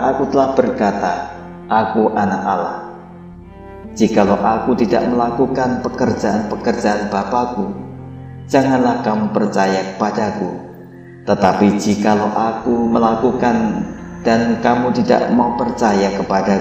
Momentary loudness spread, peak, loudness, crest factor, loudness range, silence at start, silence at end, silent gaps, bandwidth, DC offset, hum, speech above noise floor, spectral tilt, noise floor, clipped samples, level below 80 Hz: 15 LU; 0 dBFS; -16 LUFS; 16 dB; 3 LU; 0 s; 0 s; none; 8.6 kHz; under 0.1%; none; 21 dB; -6.5 dB/octave; -36 dBFS; under 0.1%; -46 dBFS